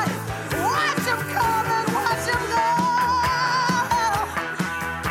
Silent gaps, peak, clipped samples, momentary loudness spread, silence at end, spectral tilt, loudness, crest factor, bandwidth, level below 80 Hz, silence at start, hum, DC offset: none; -8 dBFS; under 0.1%; 6 LU; 0 s; -4 dB/octave; -22 LUFS; 14 dB; 16.5 kHz; -46 dBFS; 0 s; none; under 0.1%